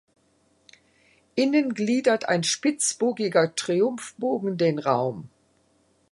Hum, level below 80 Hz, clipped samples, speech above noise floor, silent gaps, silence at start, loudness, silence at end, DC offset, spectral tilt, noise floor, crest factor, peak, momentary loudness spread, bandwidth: none; -72 dBFS; under 0.1%; 41 dB; none; 1.35 s; -24 LUFS; 0.85 s; under 0.1%; -4 dB/octave; -65 dBFS; 20 dB; -6 dBFS; 6 LU; 11.5 kHz